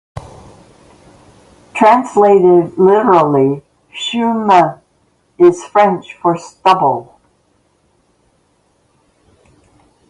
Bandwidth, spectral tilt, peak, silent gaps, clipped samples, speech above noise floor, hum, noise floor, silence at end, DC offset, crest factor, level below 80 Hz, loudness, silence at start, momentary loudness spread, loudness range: 11 kHz; -6.5 dB/octave; 0 dBFS; none; under 0.1%; 47 dB; none; -58 dBFS; 3.1 s; under 0.1%; 14 dB; -52 dBFS; -12 LUFS; 0.15 s; 14 LU; 8 LU